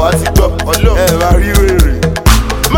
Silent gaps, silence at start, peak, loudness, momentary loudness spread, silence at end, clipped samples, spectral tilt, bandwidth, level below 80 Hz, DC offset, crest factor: none; 0 s; 0 dBFS; -10 LUFS; 2 LU; 0 s; 0.1%; -5 dB/octave; 17.5 kHz; -12 dBFS; under 0.1%; 8 dB